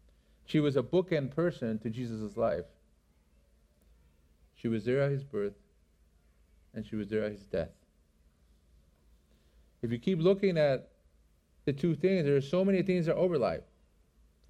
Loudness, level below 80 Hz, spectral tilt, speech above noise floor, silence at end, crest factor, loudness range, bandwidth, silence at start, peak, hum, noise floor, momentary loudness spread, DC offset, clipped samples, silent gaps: -31 LUFS; -62 dBFS; -8 dB/octave; 37 dB; 0.85 s; 18 dB; 11 LU; 11 kHz; 0.5 s; -16 dBFS; none; -67 dBFS; 11 LU; under 0.1%; under 0.1%; none